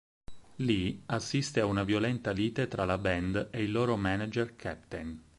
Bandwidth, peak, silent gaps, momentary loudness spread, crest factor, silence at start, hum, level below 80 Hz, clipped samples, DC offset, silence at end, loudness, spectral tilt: 11.5 kHz; -14 dBFS; none; 8 LU; 18 dB; 0.3 s; none; -52 dBFS; under 0.1%; under 0.1%; 0.15 s; -32 LUFS; -6 dB/octave